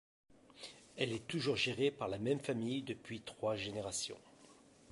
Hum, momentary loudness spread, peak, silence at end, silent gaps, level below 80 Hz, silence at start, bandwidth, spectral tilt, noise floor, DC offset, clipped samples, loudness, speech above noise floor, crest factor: none; 17 LU; -18 dBFS; 0 s; none; -70 dBFS; 0.3 s; 11.5 kHz; -4 dB/octave; -63 dBFS; under 0.1%; under 0.1%; -39 LUFS; 24 dB; 22 dB